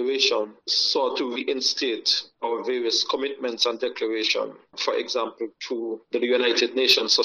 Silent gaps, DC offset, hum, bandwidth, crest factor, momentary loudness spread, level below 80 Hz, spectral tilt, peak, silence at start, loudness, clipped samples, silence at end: none; under 0.1%; none; 12 kHz; 18 dB; 9 LU; -72 dBFS; -0.5 dB/octave; -6 dBFS; 0 s; -23 LUFS; under 0.1%; 0 s